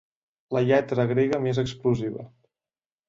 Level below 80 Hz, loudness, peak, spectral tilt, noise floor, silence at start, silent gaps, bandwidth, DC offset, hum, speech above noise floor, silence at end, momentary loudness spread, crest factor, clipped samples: -56 dBFS; -25 LUFS; -10 dBFS; -7.5 dB/octave; under -90 dBFS; 0.5 s; none; 7.6 kHz; under 0.1%; none; over 66 dB; 0.8 s; 8 LU; 16 dB; under 0.1%